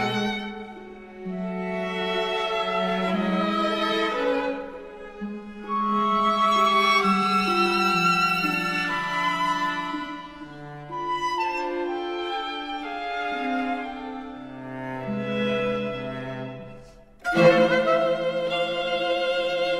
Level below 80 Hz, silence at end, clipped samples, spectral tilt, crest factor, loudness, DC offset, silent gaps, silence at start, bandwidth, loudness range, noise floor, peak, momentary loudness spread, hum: -56 dBFS; 0 s; under 0.1%; -5 dB/octave; 20 dB; -24 LUFS; under 0.1%; none; 0 s; 15.5 kHz; 9 LU; -47 dBFS; -4 dBFS; 17 LU; none